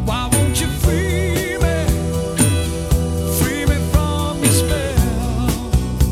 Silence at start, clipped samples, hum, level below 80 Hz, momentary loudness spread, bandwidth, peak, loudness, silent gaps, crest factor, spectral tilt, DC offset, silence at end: 0 s; under 0.1%; none; -22 dBFS; 4 LU; 16.5 kHz; 0 dBFS; -18 LUFS; none; 16 dB; -5 dB/octave; under 0.1%; 0 s